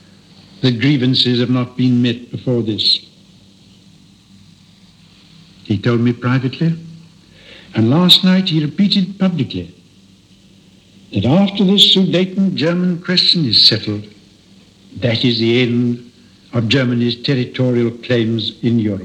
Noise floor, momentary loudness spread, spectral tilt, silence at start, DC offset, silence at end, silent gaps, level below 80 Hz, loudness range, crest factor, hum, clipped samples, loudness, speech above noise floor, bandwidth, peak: -47 dBFS; 13 LU; -6 dB/octave; 0.6 s; under 0.1%; 0 s; none; -56 dBFS; 9 LU; 16 dB; none; under 0.1%; -14 LUFS; 33 dB; 15.5 kHz; 0 dBFS